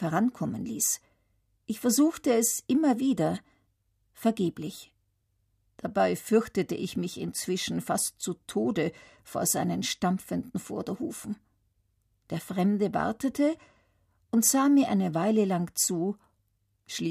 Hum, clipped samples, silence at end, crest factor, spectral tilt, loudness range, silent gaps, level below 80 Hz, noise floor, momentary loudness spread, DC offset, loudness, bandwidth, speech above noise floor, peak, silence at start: none; under 0.1%; 0 s; 20 dB; -4.5 dB/octave; 6 LU; none; -66 dBFS; -74 dBFS; 14 LU; under 0.1%; -28 LUFS; 15.5 kHz; 46 dB; -10 dBFS; 0 s